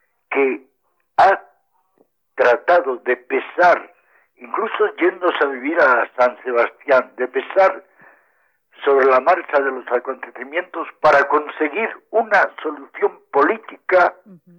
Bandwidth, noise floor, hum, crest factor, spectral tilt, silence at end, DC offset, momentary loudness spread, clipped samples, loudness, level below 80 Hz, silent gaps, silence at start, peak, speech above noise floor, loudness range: 7.8 kHz; -67 dBFS; none; 14 dB; -5 dB/octave; 0.25 s; under 0.1%; 10 LU; under 0.1%; -18 LUFS; -64 dBFS; none; 0.3 s; -4 dBFS; 49 dB; 2 LU